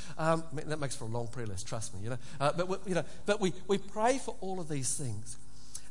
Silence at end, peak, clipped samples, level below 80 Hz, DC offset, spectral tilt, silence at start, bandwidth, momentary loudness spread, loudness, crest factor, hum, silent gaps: 0 s; -14 dBFS; under 0.1%; -58 dBFS; 2%; -4.5 dB/octave; 0 s; 11.5 kHz; 10 LU; -35 LUFS; 20 dB; none; none